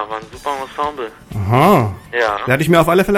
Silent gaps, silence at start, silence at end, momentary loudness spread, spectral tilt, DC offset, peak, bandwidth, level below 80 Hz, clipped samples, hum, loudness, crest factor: none; 0 s; 0 s; 14 LU; -6.5 dB/octave; under 0.1%; 0 dBFS; 17 kHz; -40 dBFS; under 0.1%; none; -16 LUFS; 16 dB